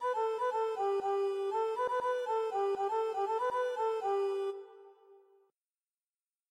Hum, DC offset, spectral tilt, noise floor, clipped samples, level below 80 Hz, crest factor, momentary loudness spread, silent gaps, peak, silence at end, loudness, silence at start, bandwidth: none; under 0.1%; -3.5 dB/octave; under -90 dBFS; under 0.1%; -84 dBFS; 12 dB; 2 LU; none; -24 dBFS; 1.35 s; -34 LUFS; 0 s; 12 kHz